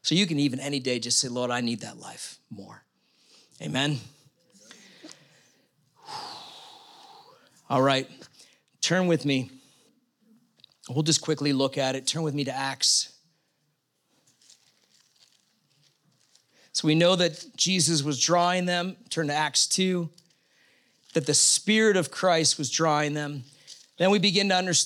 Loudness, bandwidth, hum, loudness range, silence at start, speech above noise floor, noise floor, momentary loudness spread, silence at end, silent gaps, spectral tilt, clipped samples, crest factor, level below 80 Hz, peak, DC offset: -24 LUFS; 16.5 kHz; none; 12 LU; 0.05 s; 49 dB; -74 dBFS; 18 LU; 0 s; none; -3 dB/octave; under 0.1%; 20 dB; -84 dBFS; -8 dBFS; under 0.1%